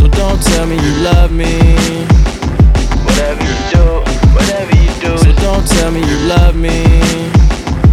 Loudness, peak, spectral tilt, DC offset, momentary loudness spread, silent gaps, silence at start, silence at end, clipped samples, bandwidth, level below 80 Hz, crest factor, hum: -11 LUFS; 0 dBFS; -5.5 dB/octave; under 0.1%; 3 LU; none; 0 s; 0 s; under 0.1%; 13.5 kHz; -12 dBFS; 8 dB; none